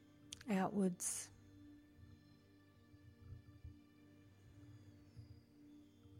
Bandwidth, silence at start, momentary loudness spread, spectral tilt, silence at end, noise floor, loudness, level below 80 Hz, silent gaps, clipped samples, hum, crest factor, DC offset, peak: 16 kHz; 0.25 s; 26 LU; -5 dB/octave; 0 s; -68 dBFS; -42 LUFS; -72 dBFS; none; under 0.1%; none; 20 dB; under 0.1%; -28 dBFS